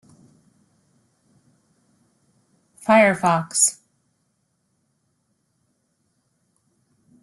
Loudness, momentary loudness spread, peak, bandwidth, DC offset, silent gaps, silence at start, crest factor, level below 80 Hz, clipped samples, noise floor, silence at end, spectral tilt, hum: -18 LUFS; 14 LU; -4 dBFS; 12.5 kHz; under 0.1%; none; 2.85 s; 24 dB; -70 dBFS; under 0.1%; -71 dBFS; 3.5 s; -3.5 dB/octave; none